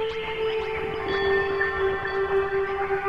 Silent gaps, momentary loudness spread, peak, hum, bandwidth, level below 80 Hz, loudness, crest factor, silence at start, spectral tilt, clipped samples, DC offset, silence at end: none; 5 LU; -12 dBFS; none; 6.6 kHz; -46 dBFS; -25 LUFS; 14 dB; 0 s; -6 dB/octave; under 0.1%; under 0.1%; 0 s